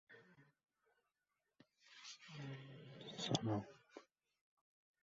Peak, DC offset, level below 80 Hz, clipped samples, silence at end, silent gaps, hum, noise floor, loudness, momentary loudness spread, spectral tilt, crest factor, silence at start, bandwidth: -22 dBFS; under 0.1%; -80 dBFS; under 0.1%; 1 s; none; none; under -90 dBFS; -46 LUFS; 23 LU; -4.5 dB/octave; 30 dB; 0.1 s; 7.6 kHz